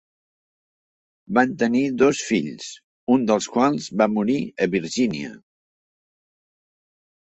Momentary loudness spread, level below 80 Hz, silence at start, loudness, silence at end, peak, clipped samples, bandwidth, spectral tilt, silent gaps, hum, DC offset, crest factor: 13 LU; -62 dBFS; 1.3 s; -21 LUFS; 1.85 s; -4 dBFS; under 0.1%; 8.2 kHz; -5 dB/octave; 2.84-3.07 s; none; under 0.1%; 20 dB